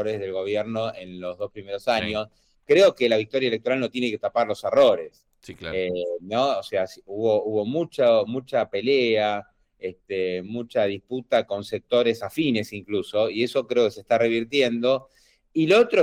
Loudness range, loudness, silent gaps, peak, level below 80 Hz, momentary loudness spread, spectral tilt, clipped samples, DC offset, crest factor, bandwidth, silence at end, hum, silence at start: 4 LU; -23 LUFS; none; -8 dBFS; -62 dBFS; 13 LU; -5.5 dB/octave; under 0.1%; under 0.1%; 14 dB; 15.5 kHz; 0 s; none; 0 s